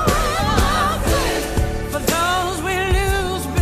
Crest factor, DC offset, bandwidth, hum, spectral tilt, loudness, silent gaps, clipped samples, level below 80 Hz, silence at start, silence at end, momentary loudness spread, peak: 14 dB; under 0.1%; 15.5 kHz; none; -4.5 dB/octave; -19 LUFS; none; under 0.1%; -24 dBFS; 0 s; 0 s; 4 LU; -4 dBFS